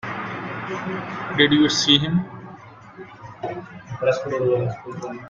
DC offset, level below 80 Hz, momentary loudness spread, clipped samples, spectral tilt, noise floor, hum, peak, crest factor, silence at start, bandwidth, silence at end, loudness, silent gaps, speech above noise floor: under 0.1%; -56 dBFS; 24 LU; under 0.1%; -4.5 dB/octave; -42 dBFS; none; -2 dBFS; 22 dB; 0.05 s; 7.6 kHz; 0 s; -21 LUFS; none; 21 dB